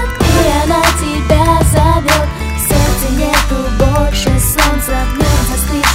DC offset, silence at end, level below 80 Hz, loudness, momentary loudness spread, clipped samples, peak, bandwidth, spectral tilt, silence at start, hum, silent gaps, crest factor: under 0.1%; 0 s; -16 dBFS; -12 LUFS; 5 LU; under 0.1%; 0 dBFS; 16.5 kHz; -4.5 dB/octave; 0 s; none; none; 12 dB